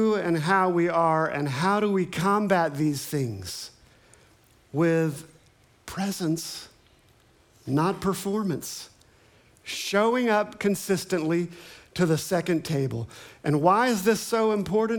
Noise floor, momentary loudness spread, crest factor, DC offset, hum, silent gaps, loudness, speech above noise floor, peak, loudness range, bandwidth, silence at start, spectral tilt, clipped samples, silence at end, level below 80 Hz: -59 dBFS; 14 LU; 20 dB; under 0.1%; none; none; -25 LUFS; 35 dB; -6 dBFS; 6 LU; 19.5 kHz; 0 s; -5.5 dB/octave; under 0.1%; 0 s; -62 dBFS